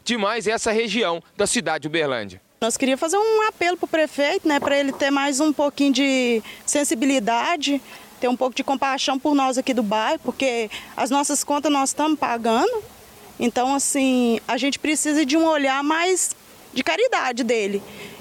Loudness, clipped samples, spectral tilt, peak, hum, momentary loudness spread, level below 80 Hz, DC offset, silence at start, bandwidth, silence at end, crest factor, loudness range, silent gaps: -21 LUFS; under 0.1%; -2.5 dB/octave; -10 dBFS; none; 6 LU; -60 dBFS; under 0.1%; 0.05 s; 17 kHz; 0 s; 12 dB; 2 LU; none